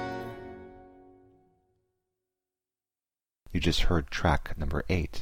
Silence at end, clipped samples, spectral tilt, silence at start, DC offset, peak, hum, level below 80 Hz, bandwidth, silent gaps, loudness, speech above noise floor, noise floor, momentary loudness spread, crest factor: 0 s; under 0.1%; -5.5 dB/octave; 0 s; under 0.1%; -12 dBFS; none; -38 dBFS; 15.5 kHz; none; -30 LUFS; over 63 dB; under -90 dBFS; 18 LU; 20 dB